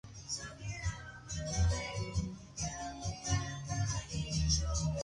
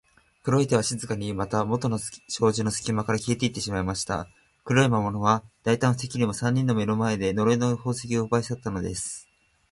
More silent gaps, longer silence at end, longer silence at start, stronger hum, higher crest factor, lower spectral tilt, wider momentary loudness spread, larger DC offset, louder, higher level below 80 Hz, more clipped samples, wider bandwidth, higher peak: neither; second, 0 s vs 0.5 s; second, 0.05 s vs 0.45 s; neither; about the same, 18 dB vs 20 dB; second, -4 dB/octave vs -5.5 dB/octave; about the same, 9 LU vs 8 LU; neither; second, -37 LUFS vs -26 LUFS; first, -42 dBFS vs -50 dBFS; neither; about the same, 11.5 kHz vs 11.5 kHz; second, -18 dBFS vs -6 dBFS